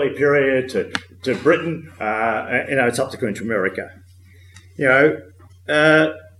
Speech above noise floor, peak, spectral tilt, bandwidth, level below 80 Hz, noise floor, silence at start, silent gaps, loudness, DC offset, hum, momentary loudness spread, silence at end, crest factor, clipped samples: 28 dB; -2 dBFS; -5.5 dB/octave; 13 kHz; -60 dBFS; -46 dBFS; 0 s; none; -19 LUFS; under 0.1%; none; 13 LU; 0.15 s; 18 dB; under 0.1%